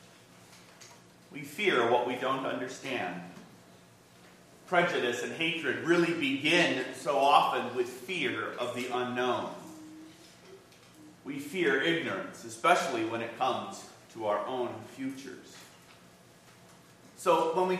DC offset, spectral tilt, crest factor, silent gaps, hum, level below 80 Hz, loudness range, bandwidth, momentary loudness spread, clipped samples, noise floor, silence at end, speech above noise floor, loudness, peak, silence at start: under 0.1%; -4 dB/octave; 26 dB; none; none; -80 dBFS; 9 LU; 15 kHz; 21 LU; under 0.1%; -57 dBFS; 0 s; 27 dB; -30 LUFS; -6 dBFS; 0.5 s